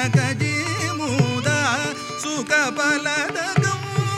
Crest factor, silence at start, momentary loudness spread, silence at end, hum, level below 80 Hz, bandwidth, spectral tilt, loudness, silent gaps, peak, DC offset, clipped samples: 16 dB; 0 s; 5 LU; 0 s; none; -54 dBFS; 14.5 kHz; -4.5 dB/octave; -21 LUFS; none; -4 dBFS; under 0.1%; under 0.1%